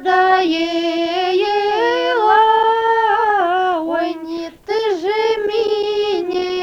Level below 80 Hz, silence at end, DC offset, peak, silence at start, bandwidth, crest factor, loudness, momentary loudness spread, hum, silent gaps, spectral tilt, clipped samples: -56 dBFS; 0 s; under 0.1%; -2 dBFS; 0 s; 8.2 kHz; 14 dB; -16 LUFS; 7 LU; none; none; -3.5 dB/octave; under 0.1%